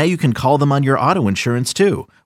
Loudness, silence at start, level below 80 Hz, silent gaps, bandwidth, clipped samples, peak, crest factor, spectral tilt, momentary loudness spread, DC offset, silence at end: -16 LUFS; 0 s; -48 dBFS; none; 15 kHz; under 0.1%; -2 dBFS; 14 dB; -6 dB/octave; 3 LU; under 0.1%; 0.2 s